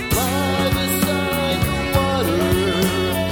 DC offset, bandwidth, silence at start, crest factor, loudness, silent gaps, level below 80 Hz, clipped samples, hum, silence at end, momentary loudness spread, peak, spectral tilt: under 0.1%; 19 kHz; 0 s; 14 dB; -19 LUFS; none; -34 dBFS; under 0.1%; none; 0 s; 2 LU; -4 dBFS; -4.5 dB/octave